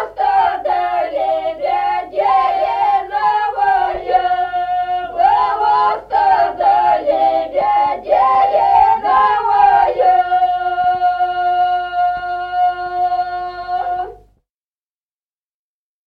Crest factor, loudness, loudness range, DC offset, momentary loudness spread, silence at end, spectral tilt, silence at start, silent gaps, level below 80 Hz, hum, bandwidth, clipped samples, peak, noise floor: 14 dB; -15 LUFS; 7 LU; under 0.1%; 7 LU; 1.9 s; -5 dB/octave; 0 s; none; -48 dBFS; none; 5.4 kHz; under 0.1%; -2 dBFS; under -90 dBFS